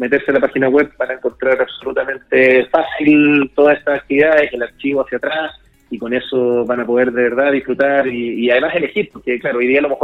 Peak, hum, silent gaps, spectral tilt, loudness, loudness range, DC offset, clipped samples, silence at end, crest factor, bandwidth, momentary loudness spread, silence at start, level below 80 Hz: 0 dBFS; none; none; -7.5 dB/octave; -15 LUFS; 4 LU; under 0.1%; under 0.1%; 0 s; 14 dB; 5.2 kHz; 9 LU; 0 s; -52 dBFS